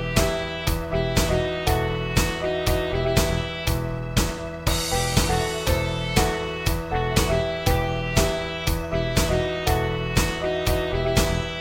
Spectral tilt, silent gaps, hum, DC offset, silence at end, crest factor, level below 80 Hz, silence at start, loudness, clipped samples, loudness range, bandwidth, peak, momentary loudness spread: -4.5 dB/octave; none; none; under 0.1%; 0 s; 18 dB; -30 dBFS; 0 s; -24 LUFS; under 0.1%; 1 LU; 17 kHz; -4 dBFS; 4 LU